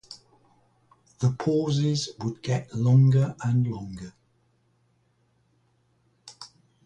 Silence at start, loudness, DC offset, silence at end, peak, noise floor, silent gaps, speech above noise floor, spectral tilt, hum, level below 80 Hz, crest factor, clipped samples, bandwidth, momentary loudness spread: 0.1 s; -25 LUFS; under 0.1%; 0.4 s; -10 dBFS; -68 dBFS; none; 44 dB; -7 dB/octave; none; -60 dBFS; 18 dB; under 0.1%; 9.2 kHz; 26 LU